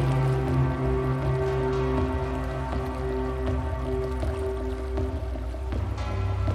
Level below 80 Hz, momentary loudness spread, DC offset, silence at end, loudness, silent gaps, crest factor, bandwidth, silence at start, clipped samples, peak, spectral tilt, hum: -32 dBFS; 6 LU; under 0.1%; 0 s; -28 LUFS; none; 14 dB; 11.5 kHz; 0 s; under 0.1%; -12 dBFS; -8 dB/octave; none